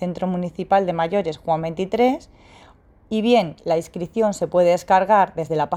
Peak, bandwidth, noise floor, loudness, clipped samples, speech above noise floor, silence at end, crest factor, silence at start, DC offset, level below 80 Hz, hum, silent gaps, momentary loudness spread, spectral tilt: -4 dBFS; 14 kHz; -50 dBFS; -20 LUFS; under 0.1%; 31 dB; 0 s; 16 dB; 0 s; under 0.1%; -52 dBFS; none; none; 8 LU; -6 dB/octave